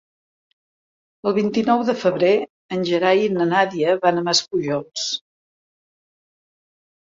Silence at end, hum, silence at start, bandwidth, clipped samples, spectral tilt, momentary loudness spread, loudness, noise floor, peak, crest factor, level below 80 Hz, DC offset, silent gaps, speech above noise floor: 1.85 s; none; 1.25 s; 7.8 kHz; under 0.1%; -4 dB/octave; 8 LU; -20 LUFS; under -90 dBFS; -2 dBFS; 18 dB; -66 dBFS; under 0.1%; 2.50-2.69 s; over 71 dB